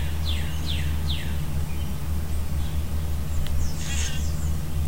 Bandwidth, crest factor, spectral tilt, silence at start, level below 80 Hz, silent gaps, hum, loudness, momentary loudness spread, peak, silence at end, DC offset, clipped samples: 16 kHz; 14 dB; -4.5 dB/octave; 0 s; -28 dBFS; none; none; -29 LUFS; 2 LU; -12 dBFS; 0 s; 4%; under 0.1%